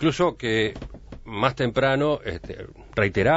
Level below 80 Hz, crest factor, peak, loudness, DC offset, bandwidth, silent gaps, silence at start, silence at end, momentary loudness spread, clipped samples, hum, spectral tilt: -44 dBFS; 20 dB; -4 dBFS; -24 LUFS; under 0.1%; 8 kHz; none; 0 s; 0 s; 18 LU; under 0.1%; none; -6 dB/octave